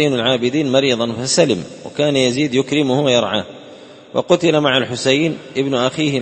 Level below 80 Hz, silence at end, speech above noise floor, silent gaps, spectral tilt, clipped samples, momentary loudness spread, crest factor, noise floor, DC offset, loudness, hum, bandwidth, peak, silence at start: -54 dBFS; 0 s; 23 dB; none; -4.5 dB/octave; under 0.1%; 8 LU; 16 dB; -39 dBFS; under 0.1%; -16 LUFS; none; 8.8 kHz; 0 dBFS; 0 s